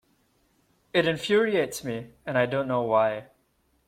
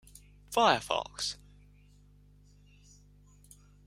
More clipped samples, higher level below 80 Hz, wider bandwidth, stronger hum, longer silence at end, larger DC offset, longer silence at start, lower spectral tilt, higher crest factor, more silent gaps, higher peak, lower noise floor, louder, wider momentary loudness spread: neither; about the same, -64 dBFS vs -60 dBFS; about the same, 16.5 kHz vs 16 kHz; second, none vs 50 Hz at -60 dBFS; second, 0.65 s vs 2.5 s; neither; first, 0.95 s vs 0.5 s; first, -5 dB/octave vs -2.5 dB/octave; second, 18 dB vs 26 dB; neither; about the same, -8 dBFS vs -10 dBFS; first, -69 dBFS vs -59 dBFS; first, -26 LUFS vs -30 LUFS; about the same, 11 LU vs 10 LU